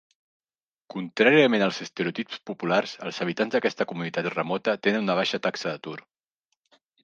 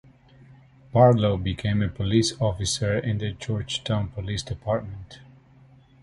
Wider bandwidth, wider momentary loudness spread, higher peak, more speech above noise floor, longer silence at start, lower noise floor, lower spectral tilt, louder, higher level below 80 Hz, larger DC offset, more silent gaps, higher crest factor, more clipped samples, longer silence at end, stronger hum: second, 7.6 kHz vs 11.5 kHz; first, 15 LU vs 12 LU; about the same, -6 dBFS vs -4 dBFS; first, over 65 dB vs 30 dB; about the same, 0.95 s vs 0.95 s; first, under -90 dBFS vs -53 dBFS; about the same, -5 dB/octave vs -5.5 dB/octave; about the same, -25 LUFS vs -24 LUFS; second, -76 dBFS vs -44 dBFS; neither; neither; about the same, 20 dB vs 20 dB; neither; first, 1.05 s vs 0.85 s; neither